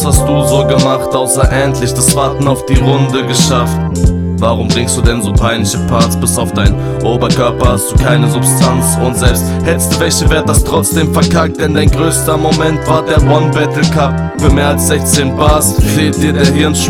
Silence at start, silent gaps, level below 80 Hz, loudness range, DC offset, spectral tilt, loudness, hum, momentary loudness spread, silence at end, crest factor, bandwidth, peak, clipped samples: 0 s; none; -20 dBFS; 1 LU; under 0.1%; -5 dB/octave; -10 LUFS; none; 3 LU; 0 s; 10 dB; over 20 kHz; 0 dBFS; 0.7%